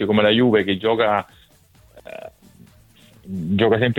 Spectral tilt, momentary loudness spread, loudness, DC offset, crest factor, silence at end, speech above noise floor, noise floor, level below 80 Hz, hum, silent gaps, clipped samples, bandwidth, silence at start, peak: -7.5 dB/octave; 23 LU; -18 LUFS; under 0.1%; 18 dB; 0 s; 35 dB; -53 dBFS; -54 dBFS; none; none; under 0.1%; 15.5 kHz; 0 s; -2 dBFS